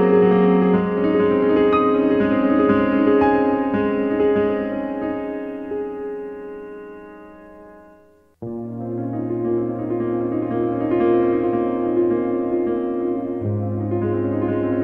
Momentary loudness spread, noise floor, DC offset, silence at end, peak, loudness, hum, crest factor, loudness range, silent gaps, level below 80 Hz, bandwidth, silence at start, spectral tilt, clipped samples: 14 LU; -52 dBFS; under 0.1%; 0 s; -4 dBFS; -20 LUFS; none; 16 dB; 14 LU; none; -50 dBFS; 4.6 kHz; 0 s; -10.5 dB/octave; under 0.1%